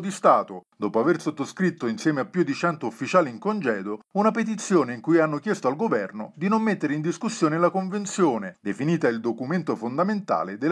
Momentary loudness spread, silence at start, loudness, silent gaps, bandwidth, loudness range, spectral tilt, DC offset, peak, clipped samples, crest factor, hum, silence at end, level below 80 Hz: 7 LU; 0 s; -24 LUFS; none; 11 kHz; 1 LU; -6 dB/octave; under 0.1%; -6 dBFS; under 0.1%; 18 dB; none; 0 s; -78 dBFS